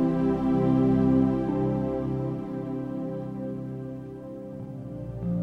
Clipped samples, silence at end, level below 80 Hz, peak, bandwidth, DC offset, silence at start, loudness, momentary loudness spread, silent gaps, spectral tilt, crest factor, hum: under 0.1%; 0 s; -46 dBFS; -12 dBFS; 5.2 kHz; under 0.1%; 0 s; -27 LUFS; 16 LU; none; -10.5 dB/octave; 14 dB; none